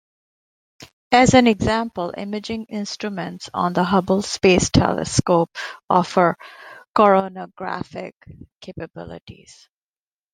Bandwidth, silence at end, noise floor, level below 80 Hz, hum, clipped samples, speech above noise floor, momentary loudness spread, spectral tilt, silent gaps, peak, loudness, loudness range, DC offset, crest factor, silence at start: 10.5 kHz; 1 s; under -90 dBFS; -44 dBFS; none; under 0.1%; over 70 dB; 19 LU; -5 dB/octave; 0.93-1.11 s, 5.84-5.88 s, 6.89-6.94 s, 8.16-8.21 s, 8.56-8.61 s, 9.21-9.27 s; 0 dBFS; -19 LUFS; 5 LU; under 0.1%; 20 dB; 0.8 s